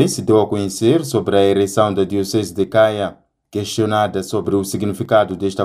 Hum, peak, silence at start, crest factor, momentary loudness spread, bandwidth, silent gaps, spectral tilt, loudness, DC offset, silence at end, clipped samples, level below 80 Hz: none; 0 dBFS; 0 s; 16 dB; 7 LU; 15.5 kHz; none; -5.5 dB/octave; -17 LUFS; under 0.1%; 0 s; under 0.1%; -54 dBFS